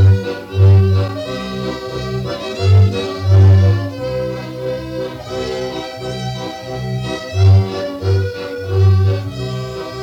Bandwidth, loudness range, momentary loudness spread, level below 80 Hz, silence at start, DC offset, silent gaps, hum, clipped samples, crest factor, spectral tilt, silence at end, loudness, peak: 7.4 kHz; 8 LU; 13 LU; -40 dBFS; 0 s; under 0.1%; none; none; under 0.1%; 12 dB; -7.5 dB/octave; 0 s; -16 LUFS; -4 dBFS